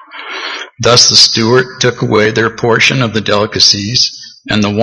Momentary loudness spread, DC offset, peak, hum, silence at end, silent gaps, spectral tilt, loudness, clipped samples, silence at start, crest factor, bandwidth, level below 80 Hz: 15 LU; under 0.1%; 0 dBFS; none; 0 s; none; -3 dB/octave; -9 LUFS; 0.8%; 0.15 s; 12 dB; 11 kHz; -44 dBFS